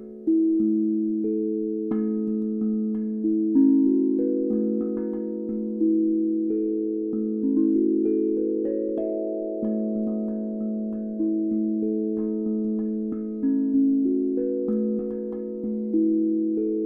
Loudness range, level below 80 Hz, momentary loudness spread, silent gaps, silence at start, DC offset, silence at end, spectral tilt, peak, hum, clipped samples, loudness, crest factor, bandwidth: 4 LU; -60 dBFS; 8 LU; none; 0 s; under 0.1%; 0 s; -13.5 dB/octave; -10 dBFS; none; under 0.1%; -25 LUFS; 14 dB; 1.8 kHz